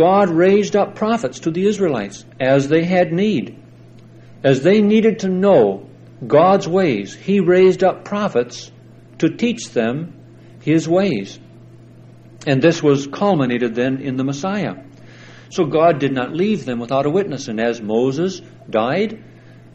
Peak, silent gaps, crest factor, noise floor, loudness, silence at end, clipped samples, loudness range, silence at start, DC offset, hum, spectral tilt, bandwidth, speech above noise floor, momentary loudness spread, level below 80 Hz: 0 dBFS; none; 16 dB; -42 dBFS; -17 LUFS; 0.5 s; under 0.1%; 5 LU; 0 s; under 0.1%; none; -6.5 dB/octave; 8.6 kHz; 26 dB; 12 LU; -56 dBFS